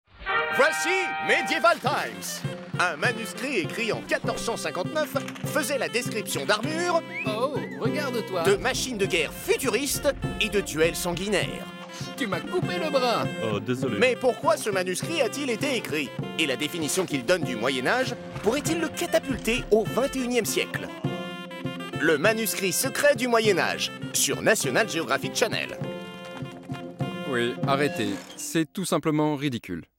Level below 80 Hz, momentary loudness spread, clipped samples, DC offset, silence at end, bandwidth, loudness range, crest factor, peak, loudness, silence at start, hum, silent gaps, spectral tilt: -52 dBFS; 10 LU; under 0.1%; under 0.1%; 0.15 s; 16.5 kHz; 4 LU; 16 dB; -10 dBFS; -26 LUFS; 0.15 s; none; none; -3.5 dB/octave